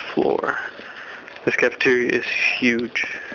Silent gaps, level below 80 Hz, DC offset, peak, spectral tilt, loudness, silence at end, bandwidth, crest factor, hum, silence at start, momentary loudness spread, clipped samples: none; -60 dBFS; under 0.1%; -4 dBFS; -4.5 dB/octave; -20 LUFS; 0 s; 7 kHz; 18 dB; none; 0 s; 17 LU; under 0.1%